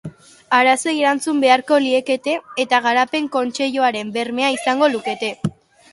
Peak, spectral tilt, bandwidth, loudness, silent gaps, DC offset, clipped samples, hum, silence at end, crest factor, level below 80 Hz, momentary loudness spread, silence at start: 0 dBFS; -3.5 dB/octave; 11.5 kHz; -18 LUFS; none; under 0.1%; under 0.1%; none; 0.4 s; 18 dB; -62 dBFS; 9 LU; 0.05 s